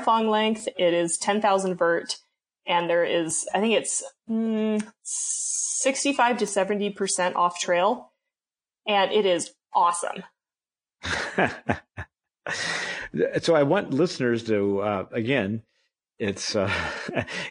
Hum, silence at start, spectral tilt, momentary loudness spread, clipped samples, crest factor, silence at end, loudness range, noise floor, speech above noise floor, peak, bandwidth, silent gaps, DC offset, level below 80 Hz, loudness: none; 0 s; -3.5 dB/octave; 9 LU; under 0.1%; 18 dB; 0 s; 3 LU; under -90 dBFS; over 66 dB; -6 dBFS; 10 kHz; none; under 0.1%; -60 dBFS; -25 LUFS